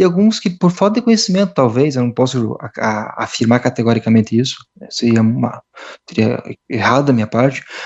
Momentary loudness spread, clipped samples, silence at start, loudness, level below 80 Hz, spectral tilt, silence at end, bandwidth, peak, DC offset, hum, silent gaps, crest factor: 10 LU; under 0.1%; 0 s; -15 LUFS; -56 dBFS; -6 dB/octave; 0 s; 8.2 kHz; 0 dBFS; under 0.1%; none; none; 14 dB